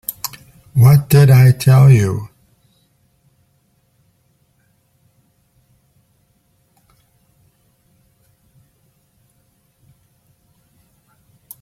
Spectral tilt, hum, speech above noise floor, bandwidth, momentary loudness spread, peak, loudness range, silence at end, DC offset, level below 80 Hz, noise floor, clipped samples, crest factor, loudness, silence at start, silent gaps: -7 dB/octave; none; 51 dB; 15.5 kHz; 19 LU; -2 dBFS; 9 LU; 9.35 s; under 0.1%; -48 dBFS; -61 dBFS; under 0.1%; 16 dB; -12 LUFS; 0.1 s; none